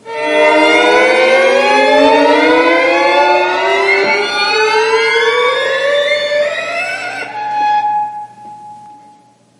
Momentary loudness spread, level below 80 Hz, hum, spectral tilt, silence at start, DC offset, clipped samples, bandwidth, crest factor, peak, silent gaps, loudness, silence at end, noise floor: 10 LU; -58 dBFS; none; -2.5 dB/octave; 0.05 s; under 0.1%; under 0.1%; 11.5 kHz; 12 dB; 0 dBFS; none; -11 LUFS; 0.65 s; -46 dBFS